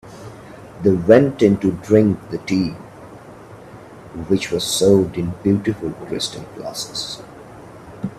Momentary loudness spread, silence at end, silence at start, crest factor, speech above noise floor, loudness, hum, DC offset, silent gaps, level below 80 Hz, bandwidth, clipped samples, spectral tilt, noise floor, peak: 25 LU; 0 s; 0.05 s; 20 dB; 22 dB; -18 LUFS; none; under 0.1%; none; -50 dBFS; 13.5 kHz; under 0.1%; -5.5 dB/octave; -39 dBFS; 0 dBFS